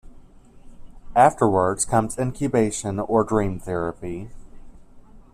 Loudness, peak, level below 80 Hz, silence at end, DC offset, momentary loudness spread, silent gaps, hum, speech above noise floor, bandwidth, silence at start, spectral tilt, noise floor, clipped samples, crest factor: -22 LUFS; -4 dBFS; -44 dBFS; 0.15 s; under 0.1%; 14 LU; none; none; 25 dB; 14.5 kHz; 0.05 s; -6 dB/octave; -46 dBFS; under 0.1%; 20 dB